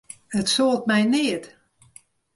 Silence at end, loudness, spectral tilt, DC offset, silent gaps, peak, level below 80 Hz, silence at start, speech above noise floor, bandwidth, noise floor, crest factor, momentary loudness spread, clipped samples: 0.9 s; -22 LUFS; -4 dB/octave; under 0.1%; none; -10 dBFS; -62 dBFS; 0.3 s; 32 dB; 11.5 kHz; -53 dBFS; 14 dB; 8 LU; under 0.1%